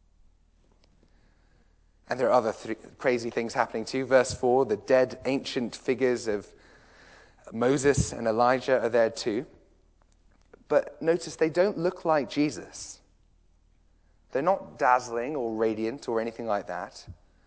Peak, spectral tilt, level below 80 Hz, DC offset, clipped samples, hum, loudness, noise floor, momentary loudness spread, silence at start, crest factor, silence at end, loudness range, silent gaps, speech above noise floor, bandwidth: -8 dBFS; -5 dB/octave; -54 dBFS; under 0.1%; under 0.1%; none; -27 LUFS; -62 dBFS; 12 LU; 2.1 s; 20 dB; 0.3 s; 4 LU; none; 36 dB; 8 kHz